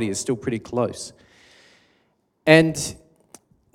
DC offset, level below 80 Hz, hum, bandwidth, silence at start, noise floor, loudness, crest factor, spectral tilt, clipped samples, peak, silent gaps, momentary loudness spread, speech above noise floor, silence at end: under 0.1%; -56 dBFS; none; 16 kHz; 0 s; -67 dBFS; -21 LUFS; 24 dB; -4.5 dB/octave; under 0.1%; 0 dBFS; none; 16 LU; 46 dB; 0.8 s